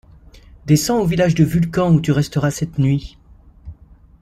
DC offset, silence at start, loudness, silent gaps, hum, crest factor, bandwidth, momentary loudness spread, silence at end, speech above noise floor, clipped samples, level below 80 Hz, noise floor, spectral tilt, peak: under 0.1%; 0.65 s; -17 LUFS; none; none; 16 dB; 15 kHz; 5 LU; 0.5 s; 30 dB; under 0.1%; -40 dBFS; -46 dBFS; -6.5 dB/octave; -2 dBFS